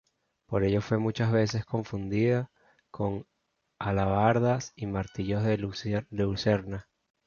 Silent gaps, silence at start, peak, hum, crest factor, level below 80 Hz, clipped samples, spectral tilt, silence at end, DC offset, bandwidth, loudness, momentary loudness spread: none; 0.5 s; -8 dBFS; none; 20 dB; -50 dBFS; under 0.1%; -7 dB/octave; 0.45 s; under 0.1%; 7.2 kHz; -29 LUFS; 9 LU